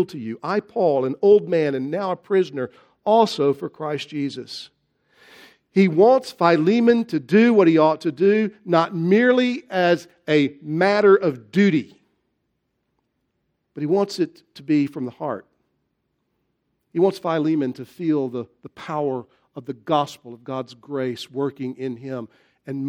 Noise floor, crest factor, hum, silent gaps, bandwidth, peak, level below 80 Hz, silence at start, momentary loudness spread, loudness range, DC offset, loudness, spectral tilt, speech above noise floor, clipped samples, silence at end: -74 dBFS; 20 dB; none; none; 10.5 kHz; -2 dBFS; -72 dBFS; 0 s; 16 LU; 9 LU; under 0.1%; -20 LUFS; -7 dB/octave; 54 dB; under 0.1%; 0 s